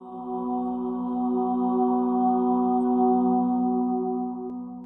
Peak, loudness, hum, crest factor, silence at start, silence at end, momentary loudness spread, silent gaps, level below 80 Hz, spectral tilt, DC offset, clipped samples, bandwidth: -10 dBFS; -25 LUFS; 60 Hz at -55 dBFS; 14 dB; 0 s; 0 s; 9 LU; none; -60 dBFS; -12 dB/octave; under 0.1%; under 0.1%; 3.2 kHz